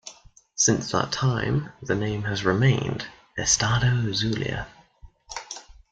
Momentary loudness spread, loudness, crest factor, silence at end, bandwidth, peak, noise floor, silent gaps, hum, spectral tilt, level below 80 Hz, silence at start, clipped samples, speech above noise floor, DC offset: 17 LU; -24 LUFS; 20 dB; 0.2 s; 9.2 kHz; -4 dBFS; -51 dBFS; none; none; -4 dB/octave; -48 dBFS; 0.05 s; under 0.1%; 27 dB; under 0.1%